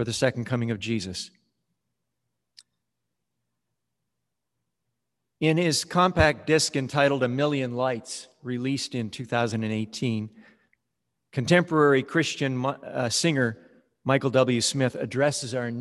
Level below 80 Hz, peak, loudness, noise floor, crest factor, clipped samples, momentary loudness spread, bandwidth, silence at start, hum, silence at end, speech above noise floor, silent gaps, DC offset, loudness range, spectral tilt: -50 dBFS; -6 dBFS; -25 LUFS; -84 dBFS; 22 dB; under 0.1%; 12 LU; 12.5 kHz; 0 s; none; 0 s; 59 dB; none; under 0.1%; 8 LU; -4.5 dB/octave